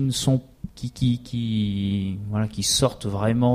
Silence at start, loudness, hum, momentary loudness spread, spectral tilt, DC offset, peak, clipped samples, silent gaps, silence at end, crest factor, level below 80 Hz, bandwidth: 0 s; -24 LUFS; none; 7 LU; -5 dB/octave; under 0.1%; -6 dBFS; under 0.1%; none; 0 s; 18 dB; -46 dBFS; 15.5 kHz